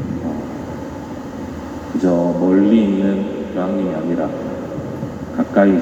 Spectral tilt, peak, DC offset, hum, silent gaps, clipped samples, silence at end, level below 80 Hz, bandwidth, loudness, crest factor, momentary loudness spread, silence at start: -8 dB/octave; 0 dBFS; under 0.1%; none; none; under 0.1%; 0 s; -44 dBFS; 8.2 kHz; -19 LUFS; 18 dB; 15 LU; 0 s